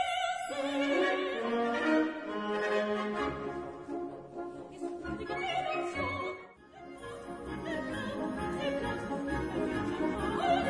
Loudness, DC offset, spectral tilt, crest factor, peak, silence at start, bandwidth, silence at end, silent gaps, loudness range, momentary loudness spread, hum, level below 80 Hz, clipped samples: -34 LUFS; under 0.1%; -5 dB/octave; 16 dB; -16 dBFS; 0 s; 10.5 kHz; 0 s; none; 6 LU; 13 LU; none; -54 dBFS; under 0.1%